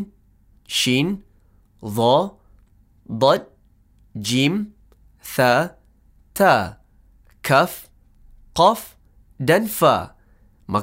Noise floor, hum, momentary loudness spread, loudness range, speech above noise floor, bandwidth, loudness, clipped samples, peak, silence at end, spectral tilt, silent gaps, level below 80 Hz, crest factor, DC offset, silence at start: -55 dBFS; none; 18 LU; 3 LU; 37 dB; 16 kHz; -19 LUFS; under 0.1%; -2 dBFS; 0 s; -4.5 dB/octave; none; -52 dBFS; 20 dB; under 0.1%; 0 s